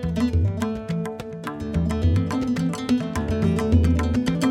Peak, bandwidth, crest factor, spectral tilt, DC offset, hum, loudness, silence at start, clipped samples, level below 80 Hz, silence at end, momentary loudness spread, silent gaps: -6 dBFS; 13 kHz; 16 dB; -7.5 dB/octave; under 0.1%; none; -23 LUFS; 0 s; under 0.1%; -32 dBFS; 0 s; 9 LU; none